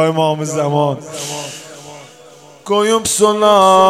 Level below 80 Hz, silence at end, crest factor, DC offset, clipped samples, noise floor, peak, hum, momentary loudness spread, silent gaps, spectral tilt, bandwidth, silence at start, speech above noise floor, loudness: -56 dBFS; 0 s; 14 dB; under 0.1%; under 0.1%; -41 dBFS; 0 dBFS; none; 23 LU; none; -4 dB/octave; 16 kHz; 0 s; 28 dB; -14 LUFS